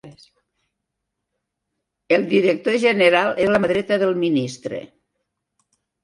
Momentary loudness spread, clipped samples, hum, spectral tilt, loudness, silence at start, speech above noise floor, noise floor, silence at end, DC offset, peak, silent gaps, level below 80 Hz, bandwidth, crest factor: 13 LU; under 0.1%; none; -5.5 dB/octave; -18 LUFS; 0.05 s; 61 dB; -79 dBFS; 1.2 s; under 0.1%; -2 dBFS; none; -60 dBFS; 11.5 kHz; 20 dB